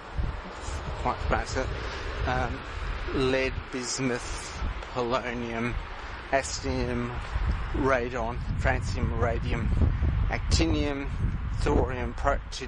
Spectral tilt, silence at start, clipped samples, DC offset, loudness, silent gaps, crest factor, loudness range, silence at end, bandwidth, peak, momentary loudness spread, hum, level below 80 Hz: -5.5 dB/octave; 0 s; under 0.1%; under 0.1%; -30 LUFS; none; 20 dB; 3 LU; 0 s; 11 kHz; -8 dBFS; 9 LU; none; -32 dBFS